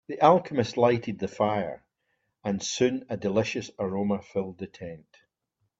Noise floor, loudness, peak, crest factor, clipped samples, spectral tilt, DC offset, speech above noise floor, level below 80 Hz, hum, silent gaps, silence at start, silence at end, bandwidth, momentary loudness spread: -78 dBFS; -27 LUFS; -6 dBFS; 22 dB; under 0.1%; -5.5 dB/octave; under 0.1%; 51 dB; -64 dBFS; none; none; 0.1 s; 0.8 s; 7.8 kHz; 16 LU